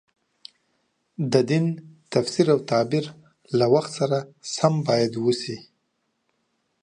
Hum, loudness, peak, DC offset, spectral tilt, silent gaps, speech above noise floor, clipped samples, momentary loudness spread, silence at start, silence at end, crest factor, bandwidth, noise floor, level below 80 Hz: none; -23 LUFS; -4 dBFS; under 0.1%; -6 dB/octave; none; 52 dB; under 0.1%; 13 LU; 1.2 s; 1.2 s; 20 dB; 11 kHz; -74 dBFS; -68 dBFS